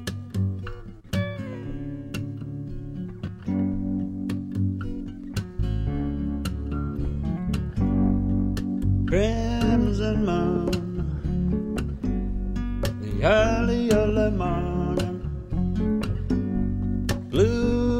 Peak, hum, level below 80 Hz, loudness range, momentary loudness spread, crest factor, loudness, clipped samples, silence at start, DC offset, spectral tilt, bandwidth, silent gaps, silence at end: -8 dBFS; none; -32 dBFS; 7 LU; 12 LU; 18 dB; -26 LUFS; under 0.1%; 0 s; under 0.1%; -7.5 dB/octave; 15.5 kHz; none; 0 s